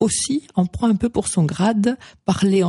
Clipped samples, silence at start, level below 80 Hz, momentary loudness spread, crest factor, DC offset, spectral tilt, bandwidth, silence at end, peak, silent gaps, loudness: under 0.1%; 0 s; -46 dBFS; 4 LU; 12 dB; under 0.1%; -5.5 dB/octave; 11.5 kHz; 0 s; -6 dBFS; none; -20 LUFS